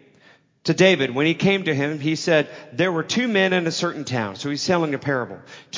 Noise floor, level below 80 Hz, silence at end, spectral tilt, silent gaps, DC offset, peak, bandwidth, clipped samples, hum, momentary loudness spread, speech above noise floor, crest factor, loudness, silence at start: -55 dBFS; -62 dBFS; 0 s; -5 dB/octave; none; under 0.1%; -4 dBFS; 7.6 kHz; under 0.1%; none; 9 LU; 34 dB; 18 dB; -21 LUFS; 0.65 s